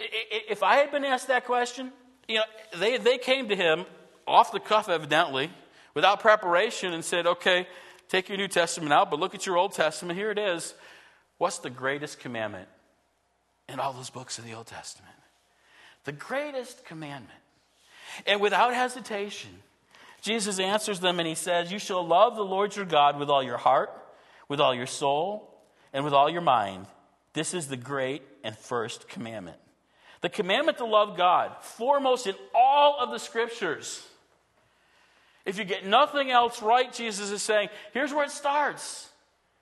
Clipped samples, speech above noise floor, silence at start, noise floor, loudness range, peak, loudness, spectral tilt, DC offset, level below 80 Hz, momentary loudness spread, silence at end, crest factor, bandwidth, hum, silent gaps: under 0.1%; 45 dB; 0 s; -71 dBFS; 11 LU; -6 dBFS; -26 LUFS; -3 dB/octave; under 0.1%; -78 dBFS; 17 LU; 0.55 s; 22 dB; 12.5 kHz; none; none